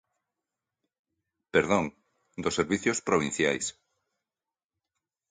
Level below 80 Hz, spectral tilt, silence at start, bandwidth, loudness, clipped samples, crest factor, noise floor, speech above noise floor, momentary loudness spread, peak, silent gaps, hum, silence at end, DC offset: -60 dBFS; -4 dB/octave; 1.55 s; 9.6 kHz; -28 LUFS; under 0.1%; 24 dB; under -90 dBFS; over 63 dB; 10 LU; -8 dBFS; none; none; 1.6 s; under 0.1%